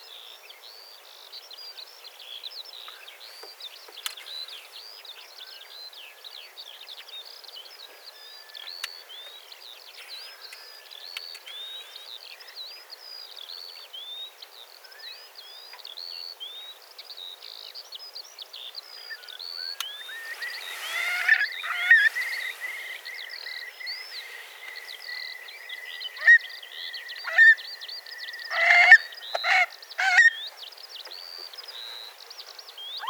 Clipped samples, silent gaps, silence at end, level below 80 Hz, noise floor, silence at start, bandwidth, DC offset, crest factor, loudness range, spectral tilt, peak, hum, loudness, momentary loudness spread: under 0.1%; none; 0 s; under -90 dBFS; -48 dBFS; 0 s; over 20 kHz; under 0.1%; 28 dB; 20 LU; 6.5 dB/octave; 0 dBFS; none; -23 LUFS; 25 LU